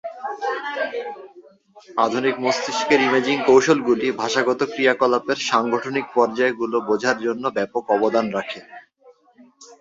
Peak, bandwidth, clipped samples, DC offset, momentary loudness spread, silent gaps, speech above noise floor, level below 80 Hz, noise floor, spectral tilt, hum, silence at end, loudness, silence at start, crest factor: -2 dBFS; 7.8 kHz; under 0.1%; under 0.1%; 11 LU; none; 33 dB; -66 dBFS; -53 dBFS; -4 dB/octave; none; 0.05 s; -20 LUFS; 0.05 s; 18 dB